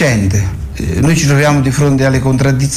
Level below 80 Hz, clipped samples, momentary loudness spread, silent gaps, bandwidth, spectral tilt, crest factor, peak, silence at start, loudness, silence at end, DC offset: -26 dBFS; under 0.1%; 8 LU; none; 15 kHz; -5.5 dB/octave; 10 dB; -2 dBFS; 0 s; -12 LUFS; 0 s; under 0.1%